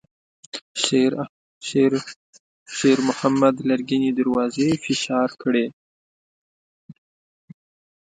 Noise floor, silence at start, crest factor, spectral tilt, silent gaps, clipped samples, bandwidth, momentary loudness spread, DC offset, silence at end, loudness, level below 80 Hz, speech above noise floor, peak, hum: under -90 dBFS; 0.55 s; 20 dB; -4.5 dB/octave; 0.62-0.75 s, 1.29-1.61 s, 2.16-2.33 s, 2.40-2.66 s, 5.73-6.89 s; under 0.1%; 9.4 kHz; 14 LU; under 0.1%; 1.1 s; -21 LUFS; -64 dBFS; over 70 dB; -2 dBFS; none